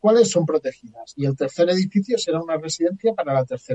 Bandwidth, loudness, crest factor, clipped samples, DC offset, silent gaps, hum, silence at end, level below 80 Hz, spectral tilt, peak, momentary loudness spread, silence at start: 9.2 kHz; -21 LUFS; 16 dB; under 0.1%; under 0.1%; none; none; 0 s; -64 dBFS; -5.5 dB/octave; -4 dBFS; 9 LU; 0.05 s